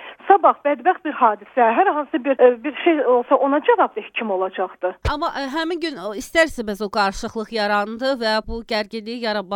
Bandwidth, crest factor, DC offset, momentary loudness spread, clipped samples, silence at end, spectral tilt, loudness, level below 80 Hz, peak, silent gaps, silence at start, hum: 16.5 kHz; 20 dB; under 0.1%; 9 LU; under 0.1%; 0 s; -4.5 dB/octave; -20 LUFS; -42 dBFS; 0 dBFS; none; 0 s; none